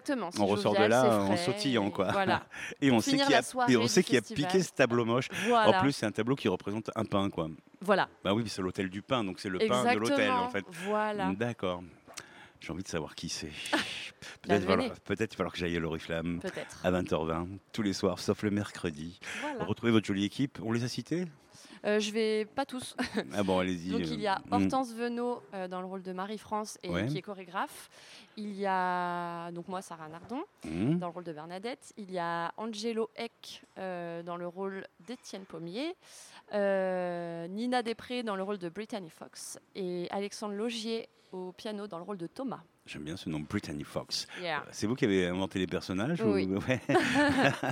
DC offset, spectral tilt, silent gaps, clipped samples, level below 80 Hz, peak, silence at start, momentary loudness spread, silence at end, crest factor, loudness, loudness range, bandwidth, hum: under 0.1%; -5 dB/octave; none; under 0.1%; -68 dBFS; -8 dBFS; 0.05 s; 15 LU; 0 s; 24 dB; -32 LUFS; 10 LU; 16.5 kHz; none